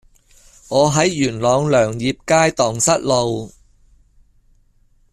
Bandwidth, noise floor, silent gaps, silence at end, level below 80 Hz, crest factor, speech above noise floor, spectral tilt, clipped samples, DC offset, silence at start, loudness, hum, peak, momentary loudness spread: 14 kHz; -55 dBFS; none; 1.65 s; -48 dBFS; 16 dB; 39 dB; -4 dB/octave; under 0.1%; under 0.1%; 0.7 s; -17 LUFS; none; -2 dBFS; 8 LU